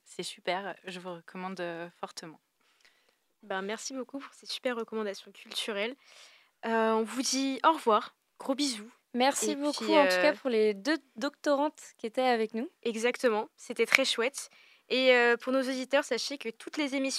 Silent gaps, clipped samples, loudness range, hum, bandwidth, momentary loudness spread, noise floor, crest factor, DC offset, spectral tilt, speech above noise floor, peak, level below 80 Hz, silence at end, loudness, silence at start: none; under 0.1%; 12 LU; none; 15.5 kHz; 17 LU; -72 dBFS; 30 dB; under 0.1%; -2.5 dB/octave; 41 dB; 0 dBFS; -86 dBFS; 0 s; -30 LUFS; 0.1 s